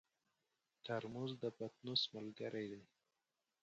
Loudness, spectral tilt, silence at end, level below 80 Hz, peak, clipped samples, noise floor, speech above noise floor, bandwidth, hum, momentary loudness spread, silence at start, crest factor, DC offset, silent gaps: -45 LUFS; -5.5 dB/octave; 0.8 s; -84 dBFS; -24 dBFS; under 0.1%; under -90 dBFS; over 45 dB; 8.2 kHz; none; 11 LU; 0.85 s; 24 dB; under 0.1%; none